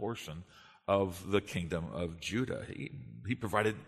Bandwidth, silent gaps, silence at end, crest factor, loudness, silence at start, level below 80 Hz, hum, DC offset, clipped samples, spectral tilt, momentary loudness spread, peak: 13.5 kHz; none; 0 s; 24 dB; -36 LUFS; 0 s; -58 dBFS; none; under 0.1%; under 0.1%; -5.5 dB/octave; 13 LU; -12 dBFS